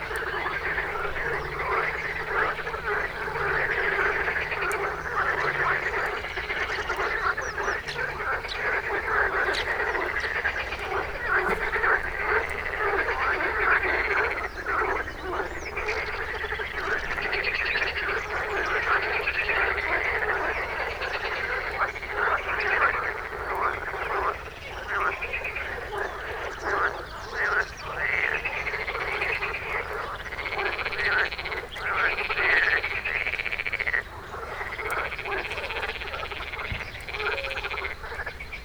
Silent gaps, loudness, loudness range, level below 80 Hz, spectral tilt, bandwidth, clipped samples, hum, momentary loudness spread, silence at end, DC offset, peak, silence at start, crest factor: none; -27 LUFS; 5 LU; -44 dBFS; -4 dB/octave; over 20 kHz; under 0.1%; none; 8 LU; 0 s; under 0.1%; -10 dBFS; 0 s; 18 dB